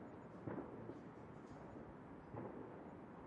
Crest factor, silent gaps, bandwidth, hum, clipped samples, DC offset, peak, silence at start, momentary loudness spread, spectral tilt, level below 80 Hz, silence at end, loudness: 18 dB; none; 10 kHz; none; under 0.1%; under 0.1%; -36 dBFS; 0 s; 6 LU; -8.5 dB/octave; -74 dBFS; 0 s; -54 LUFS